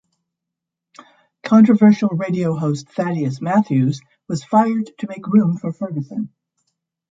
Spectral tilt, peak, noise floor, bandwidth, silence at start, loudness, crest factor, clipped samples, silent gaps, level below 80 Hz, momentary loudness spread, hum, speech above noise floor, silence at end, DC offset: -8 dB/octave; -2 dBFS; -83 dBFS; 7.8 kHz; 1.45 s; -18 LUFS; 16 dB; under 0.1%; none; -64 dBFS; 15 LU; none; 66 dB; 0.85 s; under 0.1%